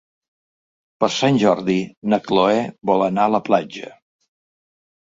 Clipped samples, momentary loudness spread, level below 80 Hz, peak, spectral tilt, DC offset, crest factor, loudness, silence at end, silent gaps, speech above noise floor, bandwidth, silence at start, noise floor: under 0.1%; 6 LU; -60 dBFS; -2 dBFS; -5.5 dB/octave; under 0.1%; 18 dB; -19 LUFS; 1.15 s; 1.97-2.02 s; over 72 dB; 7.8 kHz; 1 s; under -90 dBFS